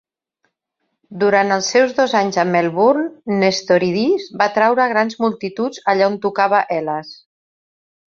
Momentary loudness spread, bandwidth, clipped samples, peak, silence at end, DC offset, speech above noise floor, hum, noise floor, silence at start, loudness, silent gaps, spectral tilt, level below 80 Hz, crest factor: 7 LU; 7.6 kHz; under 0.1%; -2 dBFS; 1.05 s; under 0.1%; 57 dB; none; -74 dBFS; 1.1 s; -17 LUFS; none; -4.5 dB/octave; -64 dBFS; 16 dB